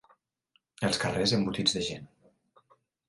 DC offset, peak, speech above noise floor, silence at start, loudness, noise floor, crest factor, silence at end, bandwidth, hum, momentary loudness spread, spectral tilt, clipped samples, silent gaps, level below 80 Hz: under 0.1%; -12 dBFS; 44 dB; 0.8 s; -28 LUFS; -73 dBFS; 20 dB; 1 s; 11.5 kHz; none; 8 LU; -4 dB/octave; under 0.1%; none; -58 dBFS